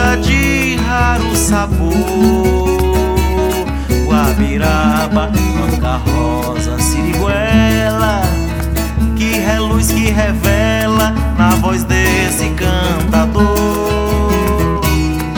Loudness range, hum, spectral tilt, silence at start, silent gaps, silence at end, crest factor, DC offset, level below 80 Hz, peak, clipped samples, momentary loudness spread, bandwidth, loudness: 1 LU; none; -5.5 dB/octave; 0 s; none; 0 s; 12 dB; under 0.1%; -18 dBFS; 0 dBFS; under 0.1%; 4 LU; over 20 kHz; -13 LUFS